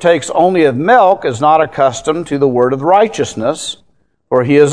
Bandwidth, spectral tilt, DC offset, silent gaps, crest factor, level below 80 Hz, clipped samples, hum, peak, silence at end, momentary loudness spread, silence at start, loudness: 10.5 kHz; -5 dB/octave; 0.4%; none; 12 dB; -52 dBFS; 0.2%; none; 0 dBFS; 0 s; 8 LU; 0 s; -12 LUFS